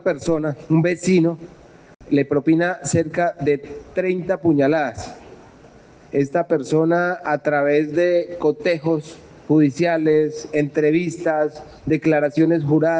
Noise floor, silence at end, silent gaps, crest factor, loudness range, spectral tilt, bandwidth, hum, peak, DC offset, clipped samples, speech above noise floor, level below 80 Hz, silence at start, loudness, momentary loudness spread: -46 dBFS; 0 s; none; 14 dB; 3 LU; -7 dB/octave; 9.4 kHz; none; -6 dBFS; under 0.1%; under 0.1%; 27 dB; -54 dBFS; 0.05 s; -19 LUFS; 7 LU